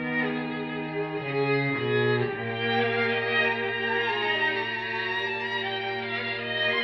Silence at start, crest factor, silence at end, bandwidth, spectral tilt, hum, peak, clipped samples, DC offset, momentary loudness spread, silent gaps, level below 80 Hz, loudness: 0 s; 14 dB; 0 s; 6.6 kHz; -7 dB/octave; none; -14 dBFS; under 0.1%; under 0.1%; 6 LU; none; -66 dBFS; -26 LUFS